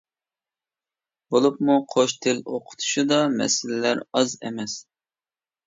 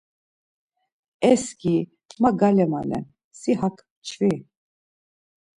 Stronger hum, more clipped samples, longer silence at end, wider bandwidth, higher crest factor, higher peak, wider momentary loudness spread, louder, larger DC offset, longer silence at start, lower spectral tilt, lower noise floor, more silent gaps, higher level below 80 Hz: neither; neither; second, 0.85 s vs 1.2 s; second, 7.8 kHz vs 11.5 kHz; about the same, 18 dB vs 20 dB; about the same, -6 dBFS vs -4 dBFS; second, 11 LU vs 16 LU; about the same, -23 LUFS vs -23 LUFS; neither; about the same, 1.3 s vs 1.2 s; second, -3.5 dB/octave vs -6.5 dB/octave; about the same, under -90 dBFS vs under -90 dBFS; second, none vs 2.05-2.09 s, 3.24-3.31 s, 3.90-4.02 s; second, -72 dBFS vs -60 dBFS